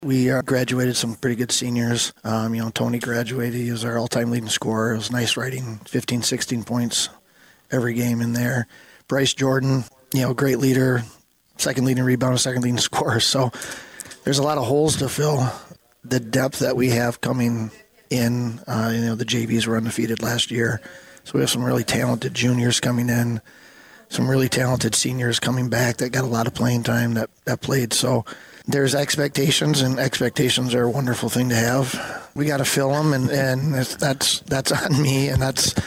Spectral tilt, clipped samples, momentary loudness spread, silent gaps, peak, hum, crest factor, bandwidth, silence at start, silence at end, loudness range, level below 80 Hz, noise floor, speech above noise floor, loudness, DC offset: -4.5 dB/octave; under 0.1%; 7 LU; none; -8 dBFS; none; 12 dB; 16.5 kHz; 0 s; 0 s; 3 LU; -50 dBFS; -54 dBFS; 33 dB; -21 LUFS; under 0.1%